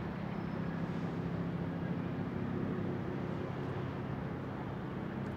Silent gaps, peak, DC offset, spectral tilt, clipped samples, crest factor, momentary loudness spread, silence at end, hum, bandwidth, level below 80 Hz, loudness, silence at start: none; -26 dBFS; under 0.1%; -9 dB/octave; under 0.1%; 12 dB; 3 LU; 0 s; none; 7.4 kHz; -58 dBFS; -39 LUFS; 0 s